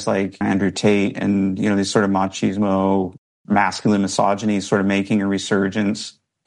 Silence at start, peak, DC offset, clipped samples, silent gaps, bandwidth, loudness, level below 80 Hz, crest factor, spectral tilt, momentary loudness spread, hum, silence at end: 0 s; -4 dBFS; under 0.1%; under 0.1%; 3.18-3.45 s; 11 kHz; -19 LUFS; -60 dBFS; 16 dB; -5.5 dB/octave; 4 LU; none; 0.35 s